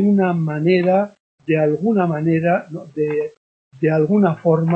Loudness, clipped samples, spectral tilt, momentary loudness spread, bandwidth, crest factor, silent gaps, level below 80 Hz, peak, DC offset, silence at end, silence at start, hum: -18 LUFS; under 0.1%; -10 dB/octave; 9 LU; 5.6 kHz; 14 dB; 1.20-1.38 s, 3.37-3.71 s; -62 dBFS; -4 dBFS; under 0.1%; 0 s; 0 s; none